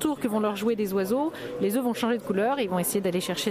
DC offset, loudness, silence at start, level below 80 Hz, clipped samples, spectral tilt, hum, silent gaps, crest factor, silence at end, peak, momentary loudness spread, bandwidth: under 0.1%; -27 LUFS; 0 s; -62 dBFS; under 0.1%; -4.5 dB/octave; none; none; 14 dB; 0 s; -12 dBFS; 2 LU; 16 kHz